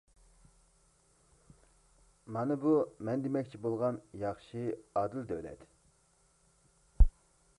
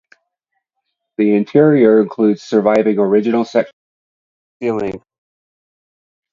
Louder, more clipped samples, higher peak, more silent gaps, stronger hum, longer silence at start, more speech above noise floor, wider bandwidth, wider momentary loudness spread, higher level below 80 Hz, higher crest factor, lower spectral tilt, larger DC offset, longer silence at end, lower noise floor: second, -35 LUFS vs -14 LUFS; neither; second, -10 dBFS vs 0 dBFS; second, none vs 3.73-4.60 s; neither; first, 2.3 s vs 1.2 s; second, 35 dB vs 61 dB; first, 11 kHz vs 7.4 kHz; second, 11 LU vs 14 LU; first, -40 dBFS vs -58 dBFS; first, 26 dB vs 16 dB; about the same, -9 dB/octave vs -8 dB/octave; neither; second, 0.5 s vs 1.35 s; second, -70 dBFS vs -75 dBFS